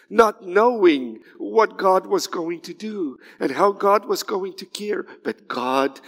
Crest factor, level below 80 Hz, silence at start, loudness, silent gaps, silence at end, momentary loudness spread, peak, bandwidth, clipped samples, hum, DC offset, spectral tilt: 20 dB; -66 dBFS; 0.1 s; -21 LUFS; none; 0.1 s; 13 LU; -2 dBFS; 16 kHz; under 0.1%; none; under 0.1%; -4 dB/octave